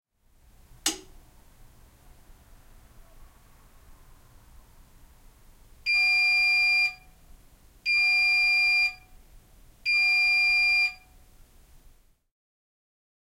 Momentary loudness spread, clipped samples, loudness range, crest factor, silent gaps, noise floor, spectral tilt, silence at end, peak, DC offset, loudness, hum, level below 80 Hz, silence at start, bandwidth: 11 LU; under 0.1%; 17 LU; 18 dB; none; -60 dBFS; 1 dB/octave; 2.4 s; -10 dBFS; under 0.1%; -21 LUFS; none; -56 dBFS; 0.85 s; 16.5 kHz